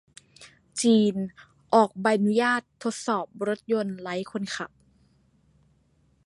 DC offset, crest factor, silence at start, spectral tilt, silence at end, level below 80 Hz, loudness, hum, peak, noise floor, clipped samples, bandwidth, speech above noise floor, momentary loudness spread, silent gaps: under 0.1%; 22 dB; 0.4 s; -5 dB/octave; 1.6 s; -68 dBFS; -26 LUFS; none; -6 dBFS; -65 dBFS; under 0.1%; 11.5 kHz; 40 dB; 12 LU; none